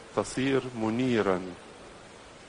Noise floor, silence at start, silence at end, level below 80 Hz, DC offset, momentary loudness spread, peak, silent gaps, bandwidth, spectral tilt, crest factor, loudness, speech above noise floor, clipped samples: -49 dBFS; 0 s; 0 s; -58 dBFS; under 0.1%; 21 LU; -12 dBFS; none; 10.5 kHz; -5.5 dB/octave; 18 dB; -29 LUFS; 21 dB; under 0.1%